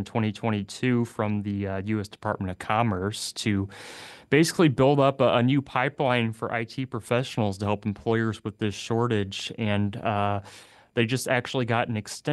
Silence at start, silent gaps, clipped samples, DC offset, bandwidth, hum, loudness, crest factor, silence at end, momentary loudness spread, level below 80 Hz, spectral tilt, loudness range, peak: 0 s; none; under 0.1%; under 0.1%; 12.5 kHz; none; -26 LUFS; 20 dB; 0 s; 10 LU; -60 dBFS; -6 dB/octave; 4 LU; -6 dBFS